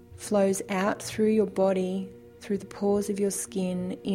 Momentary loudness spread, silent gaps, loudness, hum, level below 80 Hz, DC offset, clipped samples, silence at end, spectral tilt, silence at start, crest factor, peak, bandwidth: 9 LU; none; -27 LUFS; none; -62 dBFS; under 0.1%; under 0.1%; 0 s; -5.5 dB/octave; 0.1 s; 16 dB; -12 dBFS; 16 kHz